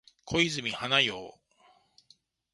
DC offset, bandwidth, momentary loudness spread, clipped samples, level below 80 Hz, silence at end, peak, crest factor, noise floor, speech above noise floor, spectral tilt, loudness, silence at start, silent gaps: under 0.1%; 11.5 kHz; 16 LU; under 0.1%; -60 dBFS; 1.25 s; -8 dBFS; 24 dB; -65 dBFS; 36 dB; -3 dB/octave; -27 LUFS; 0.25 s; none